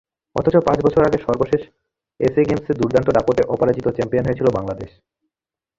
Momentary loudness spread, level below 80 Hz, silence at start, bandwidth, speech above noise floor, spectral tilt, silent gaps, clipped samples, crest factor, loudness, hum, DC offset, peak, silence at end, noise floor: 8 LU; -44 dBFS; 0.35 s; 7.6 kHz; 71 dB; -8 dB/octave; none; under 0.1%; 18 dB; -19 LUFS; none; under 0.1%; -2 dBFS; 0.9 s; -89 dBFS